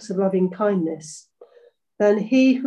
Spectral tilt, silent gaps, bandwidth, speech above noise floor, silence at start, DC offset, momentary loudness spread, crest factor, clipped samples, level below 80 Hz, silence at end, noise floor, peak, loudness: -6.5 dB/octave; none; 10 kHz; 35 dB; 0 s; under 0.1%; 18 LU; 16 dB; under 0.1%; -72 dBFS; 0 s; -55 dBFS; -6 dBFS; -21 LUFS